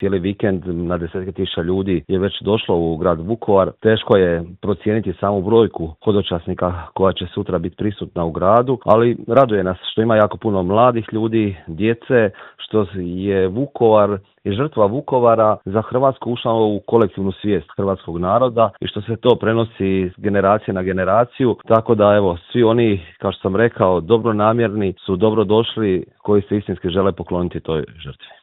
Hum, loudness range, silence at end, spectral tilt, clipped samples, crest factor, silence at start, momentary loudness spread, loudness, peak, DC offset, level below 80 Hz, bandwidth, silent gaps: none; 3 LU; 0.15 s; -10 dB/octave; under 0.1%; 16 dB; 0 s; 8 LU; -18 LUFS; 0 dBFS; under 0.1%; -50 dBFS; 4.1 kHz; none